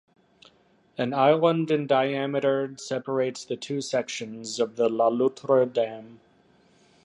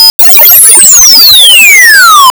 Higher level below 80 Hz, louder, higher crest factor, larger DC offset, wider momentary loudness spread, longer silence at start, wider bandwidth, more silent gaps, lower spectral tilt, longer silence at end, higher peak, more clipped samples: second, -76 dBFS vs -40 dBFS; second, -25 LUFS vs 3 LUFS; first, 20 dB vs 0 dB; neither; first, 11 LU vs 1 LU; first, 1 s vs 0 s; second, 11 kHz vs over 20 kHz; second, none vs 0.10-0.19 s; first, -5.5 dB/octave vs 3 dB/octave; first, 0.9 s vs 0.05 s; second, -6 dBFS vs 0 dBFS; second, under 0.1% vs 90%